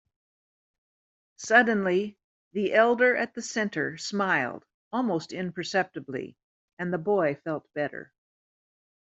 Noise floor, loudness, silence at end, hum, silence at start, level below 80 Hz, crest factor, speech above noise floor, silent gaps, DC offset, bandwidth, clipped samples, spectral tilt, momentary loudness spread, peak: under -90 dBFS; -27 LUFS; 1.15 s; none; 1.4 s; -74 dBFS; 22 dB; over 64 dB; 2.24-2.51 s, 4.74-4.91 s, 6.44-6.77 s; under 0.1%; 8.2 kHz; under 0.1%; -4.5 dB/octave; 16 LU; -6 dBFS